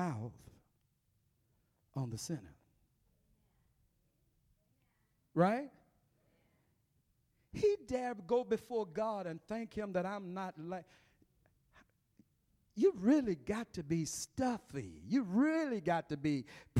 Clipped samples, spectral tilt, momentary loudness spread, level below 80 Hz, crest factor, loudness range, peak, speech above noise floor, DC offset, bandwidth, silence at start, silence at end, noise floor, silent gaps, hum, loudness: under 0.1%; -6 dB/octave; 14 LU; -68 dBFS; 20 dB; 13 LU; -18 dBFS; 42 dB; under 0.1%; 15 kHz; 0 s; 0 s; -78 dBFS; none; none; -37 LUFS